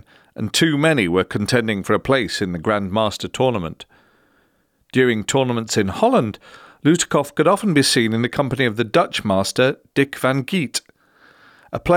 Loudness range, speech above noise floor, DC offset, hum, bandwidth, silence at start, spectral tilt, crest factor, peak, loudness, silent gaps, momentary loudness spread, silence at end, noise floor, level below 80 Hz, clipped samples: 4 LU; 44 dB; under 0.1%; none; 17.5 kHz; 0.4 s; -4.5 dB/octave; 16 dB; -4 dBFS; -19 LUFS; none; 8 LU; 0 s; -62 dBFS; -50 dBFS; under 0.1%